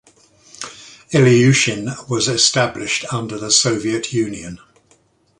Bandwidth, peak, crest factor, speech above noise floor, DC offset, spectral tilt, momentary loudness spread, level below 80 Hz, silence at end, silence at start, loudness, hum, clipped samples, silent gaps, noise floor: 11.5 kHz; 0 dBFS; 18 dB; 40 dB; under 0.1%; -3.5 dB/octave; 20 LU; -52 dBFS; 0.85 s; 0.6 s; -16 LUFS; none; under 0.1%; none; -57 dBFS